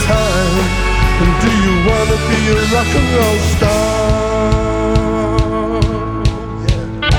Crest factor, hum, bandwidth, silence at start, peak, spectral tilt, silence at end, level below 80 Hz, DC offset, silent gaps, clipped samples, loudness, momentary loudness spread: 12 dB; none; 19 kHz; 0 s; 0 dBFS; -5.5 dB/octave; 0 s; -20 dBFS; under 0.1%; none; under 0.1%; -14 LUFS; 5 LU